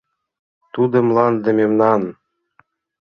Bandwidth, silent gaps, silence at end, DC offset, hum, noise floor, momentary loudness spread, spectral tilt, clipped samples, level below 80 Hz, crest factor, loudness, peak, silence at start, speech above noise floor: 6.4 kHz; none; 0.95 s; under 0.1%; none; -59 dBFS; 9 LU; -9.5 dB/octave; under 0.1%; -62 dBFS; 18 dB; -16 LUFS; -2 dBFS; 0.75 s; 43 dB